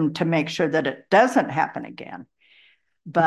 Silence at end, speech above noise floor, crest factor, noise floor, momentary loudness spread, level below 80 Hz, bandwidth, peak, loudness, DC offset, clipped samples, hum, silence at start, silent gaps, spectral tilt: 0 s; 37 dB; 18 dB; -59 dBFS; 20 LU; -68 dBFS; 12.5 kHz; -4 dBFS; -21 LUFS; under 0.1%; under 0.1%; none; 0 s; none; -6 dB/octave